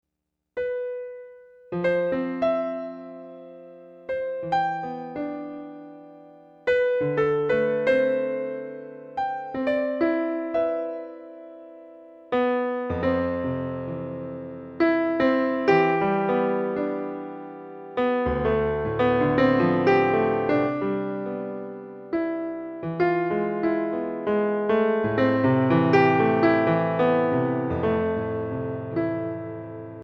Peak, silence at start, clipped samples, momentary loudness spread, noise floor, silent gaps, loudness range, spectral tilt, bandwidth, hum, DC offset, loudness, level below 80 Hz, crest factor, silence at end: -6 dBFS; 0.55 s; under 0.1%; 17 LU; -82 dBFS; none; 7 LU; -8.5 dB/octave; 6.6 kHz; none; under 0.1%; -24 LUFS; -52 dBFS; 18 dB; 0 s